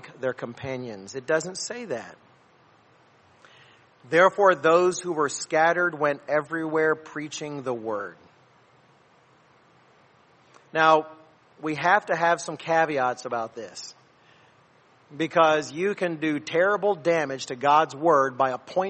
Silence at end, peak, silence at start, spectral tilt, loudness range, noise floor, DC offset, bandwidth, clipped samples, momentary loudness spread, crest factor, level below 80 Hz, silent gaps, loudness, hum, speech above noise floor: 0 s; -6 dBFS; 0.05 s; -4 dB/octave; 11 LU; -59 dBFS; under 0.1%; 8.8 kHz; under 0.1%; 15 LU; 20 dB; -74 dBFS; none; -24 LUFS; none; 35 dB